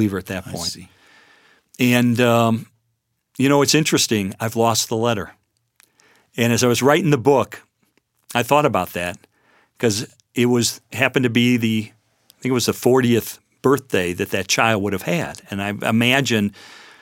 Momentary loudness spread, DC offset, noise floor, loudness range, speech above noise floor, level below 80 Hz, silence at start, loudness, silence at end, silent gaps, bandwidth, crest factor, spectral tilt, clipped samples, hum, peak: 11 LU; under 0.1%; -72 dBFS; 3 LU; 53 dB; -58 dBFS; 0 s; -19 LUFS; 0.25 s; none; 17 kHz; 20 dB; -4.5 dB/octave; under 0.1%; none; 0 dBFS